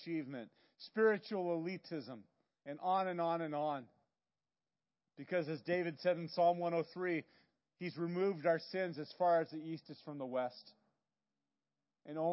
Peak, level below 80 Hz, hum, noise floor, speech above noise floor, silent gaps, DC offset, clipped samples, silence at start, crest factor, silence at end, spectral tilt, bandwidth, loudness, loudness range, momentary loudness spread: -20 dBFS; under -90 dBFS; none; under -90 dBFS; over 52 dB; none; under 0.1%; under 0.1%; 0 s; 18 dB; 0 s; -5 dB/octave; 5.8 kHz; -38 LUFS; 4 LU; 16 LU